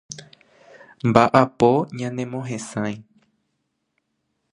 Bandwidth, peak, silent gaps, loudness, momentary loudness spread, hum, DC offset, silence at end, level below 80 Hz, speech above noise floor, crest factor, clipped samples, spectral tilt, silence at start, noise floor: 11 kHz; 0 dBFS; none; -20 LUFS; 19 LU; none; under 0.1%; 1.5 s; -58 dBFS; 55 dB; 22 dB; under 0.1%; -6.5 dB/octave; 0.1 s; -74 dBFS